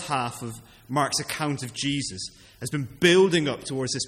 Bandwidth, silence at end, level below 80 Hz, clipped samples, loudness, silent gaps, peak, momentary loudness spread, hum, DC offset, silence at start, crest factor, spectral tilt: 15 kHz; 0 s; -58 dBFS; under 0.1%; -25 LUFS; none; -6 dBFS; 18 LU; none; under 0.1%; 0 s; 20 dB; -4 dB/octave